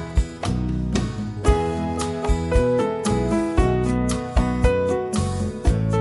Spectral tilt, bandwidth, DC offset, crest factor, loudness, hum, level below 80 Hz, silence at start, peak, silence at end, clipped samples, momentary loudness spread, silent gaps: -6.5 dB/octave; 11.5 kHz; under 0.1%; 16 dB; -22 LUFS; none; -26 dBFS; 0 s; -4 dBFS; 0 s; under 0.1%; 5 LU; none